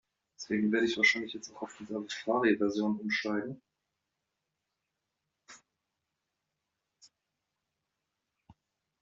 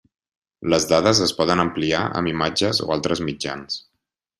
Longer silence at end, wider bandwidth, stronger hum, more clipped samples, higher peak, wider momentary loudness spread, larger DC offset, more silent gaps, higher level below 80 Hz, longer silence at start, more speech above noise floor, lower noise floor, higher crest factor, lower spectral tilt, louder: about the same, 0.5 s vs 0.6 s; second, 7.6 kHz vs 13.5 kHz; neither; neither; second, -14 dBFS vs -2 dBFS; first, 18 LU vs 12 LU; neither; neither; second, -76 dBFS vs -52 dBFS; second, 0.4 s vs 0.6 s; about the same, 55 dB vs 57 dB; first, -86 dBFS vs -78 dBFS; about the same, 22 dB vs 20 dB; about the same, -3 dB/octave vs -4 dB/octave; second, -31 LUFS vs -21 LUFS